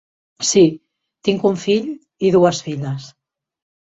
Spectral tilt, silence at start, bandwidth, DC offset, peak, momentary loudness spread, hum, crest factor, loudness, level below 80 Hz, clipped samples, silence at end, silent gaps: -5 dB/octave; 0.4 s; 8.2 kHz; under 0.1%; -2 dBFS; 14 LU; none; 16 dB; -17 LUFS; -58 dBFS; under 0.1%; 0.85 s; none